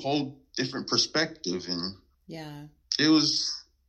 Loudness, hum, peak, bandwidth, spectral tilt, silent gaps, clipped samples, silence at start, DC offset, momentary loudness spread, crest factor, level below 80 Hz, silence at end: -27 LUFS; none; -8 dBFS; 8.4 kHz; -3 dB/octave; none; under 0.1%; 0 s; under 0.1%; 20 LU; 20 dB; -66 dBFS; 0.25 s